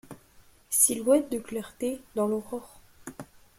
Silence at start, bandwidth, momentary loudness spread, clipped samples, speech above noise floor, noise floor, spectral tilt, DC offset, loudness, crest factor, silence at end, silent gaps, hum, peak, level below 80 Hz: 0.1 s; 16.5 kHz; 23 LU; under 0.1%; 30 dB; -57 dBFS; -3.5 dB/octave; under 0.1%; -26 LUFS; 22 dB; 0.35 s; none; none; -8 dBFS; -62 dBFS